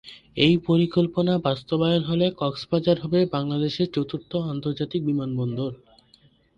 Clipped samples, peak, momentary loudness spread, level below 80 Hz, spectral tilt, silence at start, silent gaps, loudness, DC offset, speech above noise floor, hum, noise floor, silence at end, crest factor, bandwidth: under 0.1%; -6 dBFS; 8 LU; -56 dBFS; -8 dB/octave; 0.05 s; none; -24 LUFS; under 0.1%; 35 dB; none; -58 dBFS; 0.8 s; 18 dB; 7.2 kHz